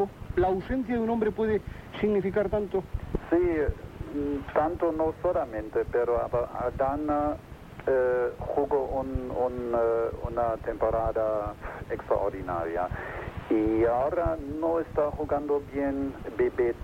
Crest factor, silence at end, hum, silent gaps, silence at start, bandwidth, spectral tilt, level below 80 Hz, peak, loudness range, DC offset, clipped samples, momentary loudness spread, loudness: 16 dB; 0 s; none; none; 0 s; 16 kHz; -8.5 dB/octave; -44 dBFS; -12 dBFS; 1 LU; under 0.1%; under 0.1%; 7 LU; -28 LUFS